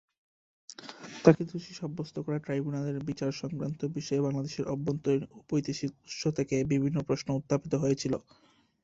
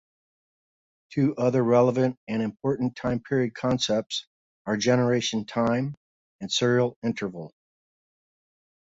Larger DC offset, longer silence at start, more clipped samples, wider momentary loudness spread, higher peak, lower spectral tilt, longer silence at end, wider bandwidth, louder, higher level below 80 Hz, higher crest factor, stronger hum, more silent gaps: neither; second, 0.7 s vs 1.1 s; neither; about the same, 10 LU vs 12 LU; about the same, -6 dBFS vs -8 dBFS; about the same, -6.5 dB/octave vs -5.5 dB/octave; second, 0.65 s vs 1.5 s; about the same, 7.8 kHz vs 8 kHz; second, -31 LUFS vs -25 LUFS; about the same, -62 dBFS vs -60 dBFS; first, 26 dB vs 18 dB; neither; second, none vs 2.17-2.27 s, 4.27-4.65 s, 5.97-6.39 s, 6.96-7.02 s